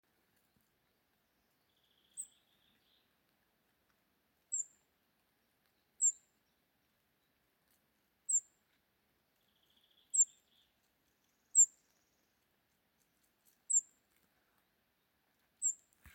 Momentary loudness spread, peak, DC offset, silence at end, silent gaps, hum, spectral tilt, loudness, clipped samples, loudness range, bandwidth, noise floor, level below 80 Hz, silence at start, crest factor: 22 LU; -18 dBFS; under 0.1%; 0.4 s; none; none; 2 dB/octave; -32 LUFS; under 0.1%; 23 LU; 16.5 kHz; -79 dBFS; -84 dBFS; 2.15 s; 24 dB